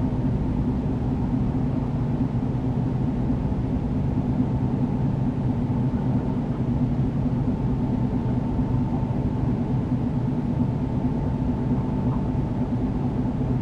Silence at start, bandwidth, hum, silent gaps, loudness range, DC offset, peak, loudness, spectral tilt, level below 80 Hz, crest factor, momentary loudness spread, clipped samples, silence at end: 0 s; 6.2 kHz; none; none; 1 LU; under 0.1%; -10 dBFS; -25 LUFS; -10.5 dB/octave; -34 dBFS; 14 dB; 1 LU; under 0.1%; 0 s